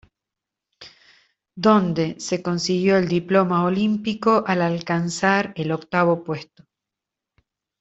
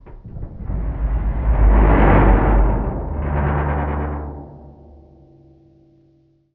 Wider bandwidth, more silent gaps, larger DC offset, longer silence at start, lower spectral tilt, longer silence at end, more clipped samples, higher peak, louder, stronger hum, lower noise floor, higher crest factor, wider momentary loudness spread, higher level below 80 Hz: first, 8 kHz vs 3.3 kHz; neither; neither; first, 0.8 s vs 0.05 s; second, -6 dB/octave vs -8.5 dB/octave; second, 1.4 s vs 1.85 s; neither; about the same, -4 dBFS vs -2 dBFS; about the same, -21 LUFS vs -19 LUFS; neither; first, -86 dBFS vs -57 dBFS; about the same, 18 dB vs 16 dB; second, 7 LU vs 20 LU; second, -60 dBFS vs -20 dBFS